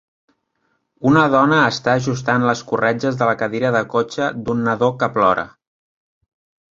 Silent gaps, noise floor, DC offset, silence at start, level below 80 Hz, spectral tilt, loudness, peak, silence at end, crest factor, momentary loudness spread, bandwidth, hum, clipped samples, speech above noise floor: none; -68 dBFS; under 0.1%; 1 s; -54 dBFS; -6 dB/octave; -17 LUFS; 0 dBFS; 1.3 s; 18 dB; 8 LU; 7.6 kHz; none; under 0.1%; 51 dB